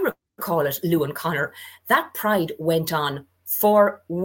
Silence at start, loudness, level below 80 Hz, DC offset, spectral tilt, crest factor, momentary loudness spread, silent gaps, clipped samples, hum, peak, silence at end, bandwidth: 0 s; -22 LUFS; -62 dBFS; under 0.1%; -5 dB/octave; 18 dB; 10 LU; none; under 0.1%; none; -4 dBFS; 0 s; 17 kHz